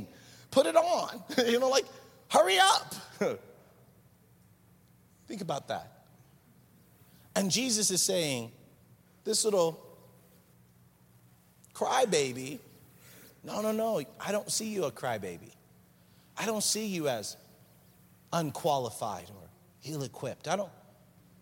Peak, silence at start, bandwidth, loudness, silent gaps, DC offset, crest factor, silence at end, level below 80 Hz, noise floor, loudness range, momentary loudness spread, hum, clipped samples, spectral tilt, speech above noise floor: -8 dBFS; 0 s; 17 kHz; -30 LUFS; none; under 0.1%; 24 dB; 0.7 s; -74 dBFS; -62 dBFS; 8 LU; 18 LU; none; under 0.1%; -3 dB/octave; 32 dB